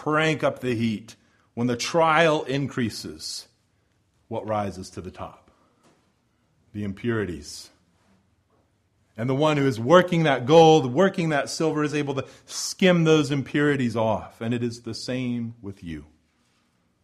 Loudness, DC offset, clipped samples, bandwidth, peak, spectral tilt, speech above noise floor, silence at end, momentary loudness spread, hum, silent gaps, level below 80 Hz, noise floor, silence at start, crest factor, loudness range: -23 LUFS; under 0.1%; under 0.1%; 14 kHz; -2 dBFS; -5.5 dB/octave; 44 dB; 1 s; 19 LU; none; none; -58 dBFS; -67 dBFS; 0 s; 22 dB; 15 LU